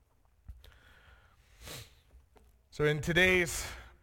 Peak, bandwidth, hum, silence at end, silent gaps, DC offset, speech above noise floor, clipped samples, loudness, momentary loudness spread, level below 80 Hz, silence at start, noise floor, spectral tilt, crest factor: -14 dBFS; 17.5 kHz; none; 0.15 s; none; under 0.1%; 34 dB; under 0.1%; -29 LUFS; 24 LU; -52 dBFS; 0.5 s; -63 dBFS; -4 dB/octave; 22 dB